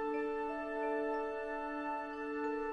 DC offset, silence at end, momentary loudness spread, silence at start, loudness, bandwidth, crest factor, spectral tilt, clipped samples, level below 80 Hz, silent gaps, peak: under 0.1%; 0 s; 4 LU; 0 s; -39 LUFS; 9.6 kHz; 12 dB; -5.5 dB/octave; under 0.1%; -62 dBFS; none; -26 dBFS